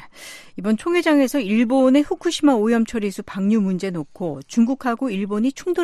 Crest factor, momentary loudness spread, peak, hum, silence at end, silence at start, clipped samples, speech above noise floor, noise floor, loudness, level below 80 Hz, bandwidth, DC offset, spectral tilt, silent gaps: 14 dB; 11 LU; -4 dBFS; none; 0 s; 0 s; under 0.1%; 21 dB; -40 dBFS; -20 LUFS; -54 dBFS; 13.5 kHz; under 0.1%; -5.5 dB/octave; none